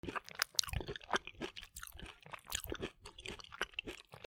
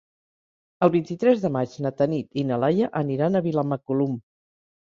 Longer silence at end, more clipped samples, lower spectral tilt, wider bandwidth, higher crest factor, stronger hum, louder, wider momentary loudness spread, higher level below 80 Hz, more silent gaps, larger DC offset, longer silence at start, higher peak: second, 0.05 s vs 0.65 s; neither; second, -2 dB/octave vs -8.5 dB/octave; first, over 20 kHz vs 7.4 kHz; first, 38 dB vs 20 dB; neither; second, -42 LUFS vs -24 LUFS; first, 15 LU vs 5 LU; first, -56 dBFS vs -66 dBFS; neither; neither; second, 0.05 s vs 0.8 s; about the same, -6 dBFS vs -4 dBFS